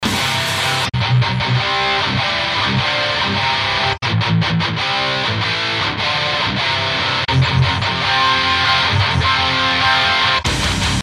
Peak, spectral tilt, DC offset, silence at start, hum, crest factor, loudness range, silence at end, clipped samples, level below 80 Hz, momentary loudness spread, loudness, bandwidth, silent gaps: -2 dBFS; -4 dB/octave; under 0.1%; 0 s; none; 14 dB; 3 LU; 0 s; under 0.1%; -36 dBFS; 4 LU; -15 LUFS; 15.5 kHz; none